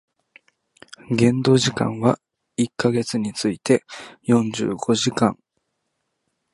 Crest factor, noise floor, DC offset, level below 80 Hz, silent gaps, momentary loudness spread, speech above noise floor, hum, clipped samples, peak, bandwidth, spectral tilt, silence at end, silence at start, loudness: 20 dB; -75 dBFS; under 0.1%; -58 dBFS; none; 10 LU; 55 dB; none; under 0.1%; -2 dBFS; 11.5 kHz; -5.5 dB/octave; 1.2 s; 1.1 s; -21 LUFS